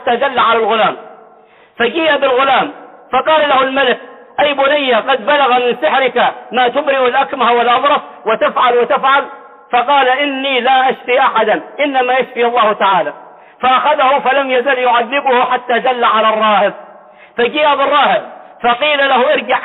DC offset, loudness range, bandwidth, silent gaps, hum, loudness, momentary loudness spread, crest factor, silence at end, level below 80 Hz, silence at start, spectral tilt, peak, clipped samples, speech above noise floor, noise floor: under 0.1%; 1 LU; 4.2 kHz; none; none; -12 LUFS; 5 LU; 12 dB; 0 s; -60 dBFS; 0 s; -7 dB/octave; -2 dBFS; under 0.1%; 32 dB; -44 dBFS